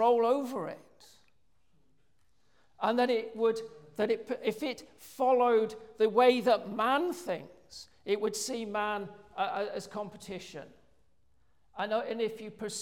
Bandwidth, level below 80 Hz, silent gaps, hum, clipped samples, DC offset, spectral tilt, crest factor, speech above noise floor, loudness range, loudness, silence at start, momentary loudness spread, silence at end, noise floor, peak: 17 kHz; -74 dBFS; none; none; under 0.1%; under 0.1%; -4 dB/octave; 20 dB; 44 dB; 9 LU; -31 LUFS; 0 s; 19 LU; 0 s; -74 dBFS; -12 dBFS